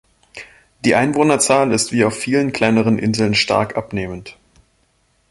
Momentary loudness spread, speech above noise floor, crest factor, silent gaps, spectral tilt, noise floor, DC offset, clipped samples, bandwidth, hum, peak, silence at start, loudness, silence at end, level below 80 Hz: 15 LU; 45 dB; 16 dB; none; -4.5 dB/octave; -61 dBFS; under 0.1%; under 0.1%; 12 kHz; none; 0 dBFS; 0.35 s; -16 LUFS; 1 s; -48 dBFS